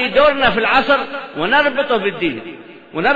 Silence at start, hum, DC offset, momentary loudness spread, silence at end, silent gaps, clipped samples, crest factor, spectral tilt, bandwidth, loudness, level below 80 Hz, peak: 0 s; none; under 0.1%; 14 LU; 0 s; none; under 0.1%; 14 dB; -6 dB/octave; 7.6 kHz; -15 LUFS; -44 dBFS; -2 dBFS